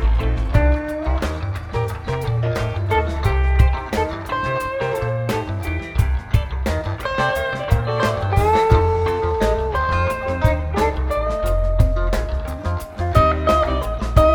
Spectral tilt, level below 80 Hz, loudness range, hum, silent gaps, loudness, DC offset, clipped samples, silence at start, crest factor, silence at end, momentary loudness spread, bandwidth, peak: -7 dB/octave; -22 dBFS; 3 LU; none; none; -20 LUFS; under 0.1%; under 0.1%; 0 s; 18 dB; 0 s; 8 LU; 19 kHz; -2 dBFS